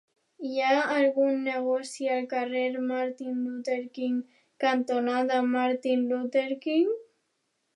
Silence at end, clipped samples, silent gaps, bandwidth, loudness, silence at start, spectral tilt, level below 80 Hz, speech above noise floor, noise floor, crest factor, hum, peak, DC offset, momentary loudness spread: 0.75 s; under 0.1%; none; 11.5 kHz; -28 LUFS; 0.4 s; -3.5 dB/octave; -86 dBFS; 50 dB; -77 dBFS; 16 dB; none; -12 dBFS; under 0.1%; 8 LU